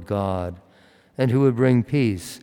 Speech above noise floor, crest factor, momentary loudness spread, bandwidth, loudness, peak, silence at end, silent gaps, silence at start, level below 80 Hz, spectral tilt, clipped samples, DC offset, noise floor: 34 dB; 16 dB; 12 LU; 17.5 kHz; -21 LUFS; -6 dBFS; 0.05 s; none; 0 s; -58 dBFS; -7.5 dB/octave; under 0.1%; under 0.1%; -55 dBFS